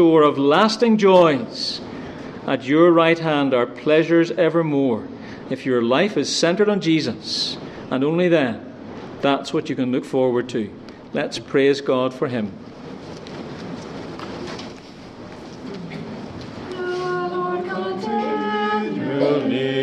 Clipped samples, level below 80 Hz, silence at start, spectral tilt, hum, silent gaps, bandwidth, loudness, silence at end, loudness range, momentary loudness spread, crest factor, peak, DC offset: under 0.1%; -58 dBFS; 0 s; -5.5 dB/octave; none; none; 10.5 kHz; -19 LUFS; 0 s; 14 LU; 19 LU; 18 dB; -2 dBFS; under 0.1%